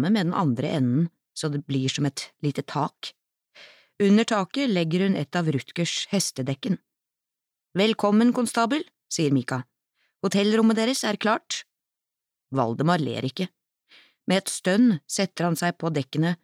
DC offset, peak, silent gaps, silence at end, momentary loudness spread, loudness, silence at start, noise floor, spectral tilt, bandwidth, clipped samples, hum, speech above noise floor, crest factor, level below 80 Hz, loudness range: under 0.1%; -8 dBFS; none; 0.1 s; 11 LU; -25 LUFS; 0 s; -87 dBFS; -5 dB/octave; 15.5 kHz; under 0.1%; none; 64 dB; 16 dB; -74 dBFS; 4 LU